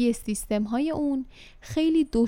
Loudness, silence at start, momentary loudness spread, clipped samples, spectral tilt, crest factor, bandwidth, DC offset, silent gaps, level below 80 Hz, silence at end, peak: -27 LUFS; 0 s; 11 LU; under 0.1%; -5.5 dB/octave; 12 dB; 16.5 kHz; under 0.1%; none; -46 dBFS; 0 s; -12 dBFS